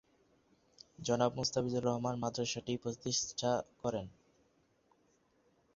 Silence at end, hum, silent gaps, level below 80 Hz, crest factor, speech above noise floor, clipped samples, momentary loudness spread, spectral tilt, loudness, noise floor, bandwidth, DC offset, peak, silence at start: 1.65 s; none; none; -68 dBFS; 22 dB; 37 dB; under 0.1%; 7 LU; -5 dB/octave; -36 LUFS; -73 dBFS; 7.6 kHz; under 0.1%; -16 dBFS; 1 s